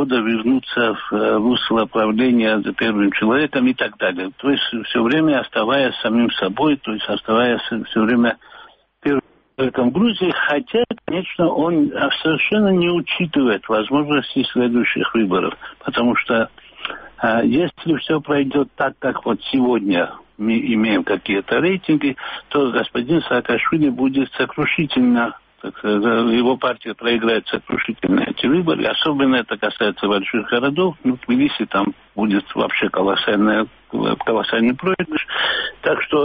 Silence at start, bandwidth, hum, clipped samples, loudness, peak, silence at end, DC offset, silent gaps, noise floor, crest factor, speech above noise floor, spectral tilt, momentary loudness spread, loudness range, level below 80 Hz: 0 s; 5 kHz; none; under 0.1%; -18 LUFS; -4 dBFS; 0 s; under 0.1%; none; -45 dBFS; 14 dB; 27 dB; -3.5 dB/octave; 6 LU; 2 LU; -54 dBFS